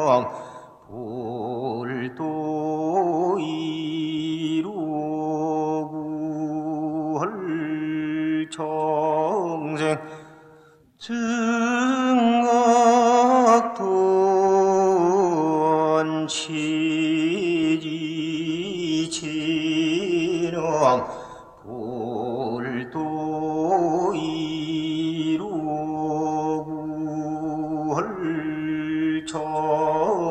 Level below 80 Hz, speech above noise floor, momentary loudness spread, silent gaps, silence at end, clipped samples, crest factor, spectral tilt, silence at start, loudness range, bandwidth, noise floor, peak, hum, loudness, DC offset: -62 dBFS; 29 dB; 11 LU; none; 0 s; under 0.1%; 20 dB; -5.5 dB/octave; 0 s; 8 LU; 9.4 kHz; -53 dBFS; -4 dBFS; none; -23 LUFS; under 0.1%